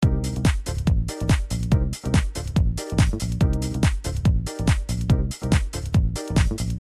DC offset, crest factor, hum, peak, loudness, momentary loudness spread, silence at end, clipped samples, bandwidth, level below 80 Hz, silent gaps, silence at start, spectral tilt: under 0.1%; 16 dB; none; -6 dBFS; -23 LUFS; 2 LU; 0 s; under 0.1%; 14 kHz; -26 dBFS; none; 0 s; -6 dB/octave